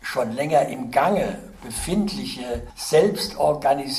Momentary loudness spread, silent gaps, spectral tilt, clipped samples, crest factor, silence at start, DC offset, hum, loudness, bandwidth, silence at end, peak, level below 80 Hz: 11 LU; none; -4.5 dB/octave; under 0.1%; 16 dB; 0 s; under 0.1%; none; -23 LUFS; 15.5 kHz; 0 s; -6 dBFS; -44 dBFS